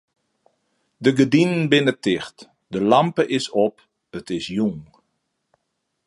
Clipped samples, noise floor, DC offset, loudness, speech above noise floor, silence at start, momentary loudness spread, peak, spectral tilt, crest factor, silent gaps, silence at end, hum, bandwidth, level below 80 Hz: under 0.1%; -76 dBFS; under 0.1%; -20 LUFS; 56 dB; 1 s; 15 LU; -2 dBFS; -6 dB/octave; 20 dB; none; 1.25 s; none; 11.5 kHz; -60 dBFS